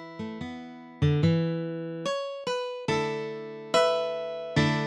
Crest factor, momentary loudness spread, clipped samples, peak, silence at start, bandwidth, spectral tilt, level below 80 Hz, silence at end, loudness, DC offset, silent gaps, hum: 18 dB; 14 LU; under 0.1%; -10 dBFS; 0 s; 10.5 kHz; -6 dB/octave; -56 dBFS; 0 s; -29 LUFS; under 0.1%; none; none